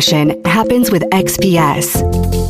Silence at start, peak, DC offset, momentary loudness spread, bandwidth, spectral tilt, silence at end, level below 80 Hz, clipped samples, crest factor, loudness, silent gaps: 0 s; 0 dBFS; under 0.1%; 3 LU; 16 kHz; -4.5 dB/octave; 0 s; -26 dBFS; under 0.1%; 12 dB; -13 LUFS; none